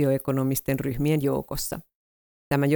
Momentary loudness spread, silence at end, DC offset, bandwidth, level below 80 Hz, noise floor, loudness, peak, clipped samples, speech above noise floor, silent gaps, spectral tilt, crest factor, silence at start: 7 LU; 0 s; under 0.1%; over 20 kHz; -46 dBFS; under -90 dBFS; -26 LUFS; -8 dBFS; under 0.1%; over 66 dB; 1.95-2.51 s; -6 dB/octave; 16 dB; 0 s